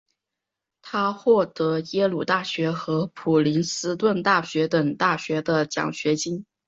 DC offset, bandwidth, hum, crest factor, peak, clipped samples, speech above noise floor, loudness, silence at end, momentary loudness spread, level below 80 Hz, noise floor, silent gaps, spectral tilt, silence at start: under 0.1%; 8 kHz; none; 18 dB; -6 dBFS; under 0.1%; 62 dB; -23 LUFS; 0.25 s; 6 LU; -66 dBFS; -85 dBFS; none; -5 dB/octave; 0.85 s